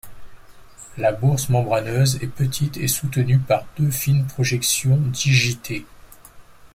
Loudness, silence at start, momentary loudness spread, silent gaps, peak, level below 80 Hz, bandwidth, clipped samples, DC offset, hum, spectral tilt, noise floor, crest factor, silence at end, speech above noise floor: -20 LUFS; 0.05 s; 6 LU; none; -4 dBFS; -46 dBFS; 16.5 kHz; under 0.1%; under 0.1%; none; -4.5 dB/octave; -44 dBFS; 16 dB; 0.1 s; 24 dB